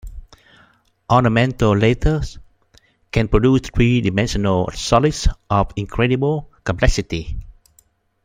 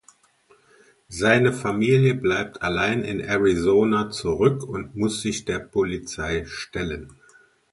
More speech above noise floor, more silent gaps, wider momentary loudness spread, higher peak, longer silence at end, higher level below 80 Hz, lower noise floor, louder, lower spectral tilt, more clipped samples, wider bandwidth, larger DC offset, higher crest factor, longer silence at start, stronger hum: first, 41 dB vs 37 dB; neither; about the same, 9 LU vs 11 LU; about the same, 0 dBFS vs -2 dBFS; first, 0.75 s vs 0.6 s; first, -28 dBFS vs -46 dBFS; about the same, -58 dBFS vs -59 dBFS; first, -18 LUFS vs -23 LUFS; about the same, -6 dB/octave vs -5.5 dB/octave; neither; first, 14.5 kHz vs 11.5 kHz; neither; about the same, 18 dB vs 20 dB; second, 0.05 s vs 1.1 s; neither